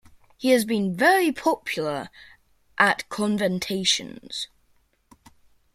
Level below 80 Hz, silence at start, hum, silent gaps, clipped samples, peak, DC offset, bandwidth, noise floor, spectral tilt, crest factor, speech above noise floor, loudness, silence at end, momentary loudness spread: -62 dBFS; 0.4 s; none; none; under 0.1%; -4 dBFS; under 0.1%; 16.5 kHz; -64 dBFS; -3.5 dB/octave; 22 dB; 41 dB; -23 LUFS; 1.3 s; 14 LU